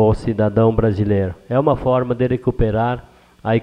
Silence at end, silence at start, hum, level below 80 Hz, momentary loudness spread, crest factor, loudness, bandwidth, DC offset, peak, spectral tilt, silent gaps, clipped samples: 0 s; 0 s; none; -32 dBFS; 5 LU; 16 dB; -18 LUFS; 9 kHz; under 0.1%; -2 dBFS; -9.5 dB/octave; none; under 0.1%